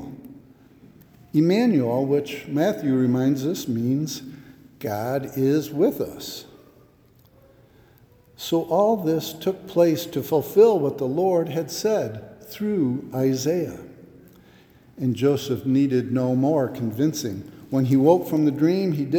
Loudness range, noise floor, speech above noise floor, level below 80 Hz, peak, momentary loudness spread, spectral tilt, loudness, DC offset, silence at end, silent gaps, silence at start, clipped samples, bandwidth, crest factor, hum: 6 LU; -55 dBFS; 34 dB; -62 dBFS; -4 dBFS; 13 LU; -6.5 dB/octave; -22 LUFS; under 0.1%; 0 s; none; 0 s; under 0.1%; over 20 kHz; 20 dB; none